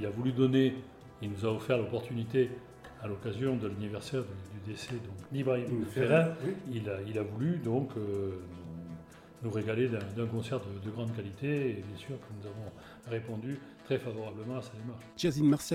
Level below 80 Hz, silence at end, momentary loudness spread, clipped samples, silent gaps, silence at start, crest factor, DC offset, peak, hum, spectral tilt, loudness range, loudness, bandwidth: -64 dBFS; 0 s; 16 LU; under 0.1%; none; 0 s; 20 dB; under 0.1%; -14 dBFS; none; -7 dB/octave; 6 LU; -34 LUFS; 16 kHz